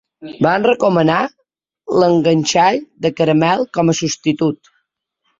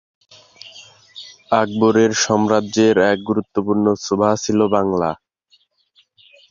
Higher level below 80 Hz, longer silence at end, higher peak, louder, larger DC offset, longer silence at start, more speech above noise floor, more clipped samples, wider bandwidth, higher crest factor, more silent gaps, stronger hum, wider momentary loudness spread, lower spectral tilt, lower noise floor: about the same, -56 dBFS vs -54 dBFS; second, 0.85 s vs 1.35 s; about the same, 0 dBFS vs -2 dBFS; about the same, -15 LUFS vs -17 LUFS; neither; second, 0.2 s vs 0.65 s; first, 55 dB vs 43 dB; neither; about the same, 7.8 kHz vs 7.4 kHz; about the same, 14 dB vs 16 dB; neither; neither; second, 7 LU vs 22 LU; about the same, -5 dB/octave vs -4.5 dB/octave; first, -70 dBFS vs -60 dBFS